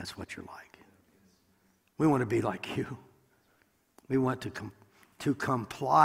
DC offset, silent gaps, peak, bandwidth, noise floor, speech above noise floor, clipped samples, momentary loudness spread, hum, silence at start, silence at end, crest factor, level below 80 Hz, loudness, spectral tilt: under 0.1%; none; -8 dBFS; 16 kHz; -69 dBFS; 40 dB; under 0.1%; 20 LU; none; 0 s; 0 s; 24 dB; -64 dBFS; -32 LUFS; -6.5 dB/octave